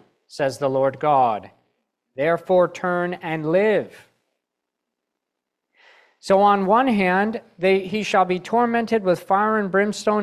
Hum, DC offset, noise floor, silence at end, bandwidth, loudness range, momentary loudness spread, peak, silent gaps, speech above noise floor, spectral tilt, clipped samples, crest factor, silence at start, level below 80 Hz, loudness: none; under 0.1%; -82 dBFS; 0 s; 13.5 kHz; 6 LU; 8 LU; -4 dBFS; none; 62 dB; -6 dB/octave; under 0.1%; 16 dB; 0.35 s; -64 dBFS; -20 LUFS